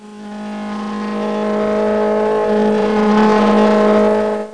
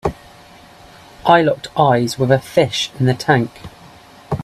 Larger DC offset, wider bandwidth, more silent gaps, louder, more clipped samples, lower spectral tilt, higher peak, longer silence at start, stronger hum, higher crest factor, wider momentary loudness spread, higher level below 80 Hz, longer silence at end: first, 0.6% vs under 0.1%; second, 10 kHz vs 14 kHz; neither; about the same, -15 LUFS vs -16 LUFS; neither; first, -7 dB/octave vs -5.5 dB/octave; about the same, 0 dBFS vs 0 dBFS; about the same, 0 s vs 0.05 s; neither; about the same, 14 dB vs 18 dB; about the same, 13 LU vs 12 LU; about the same, -48 dBFS vs -46 dBFS; about the same, 0 s vs 0 s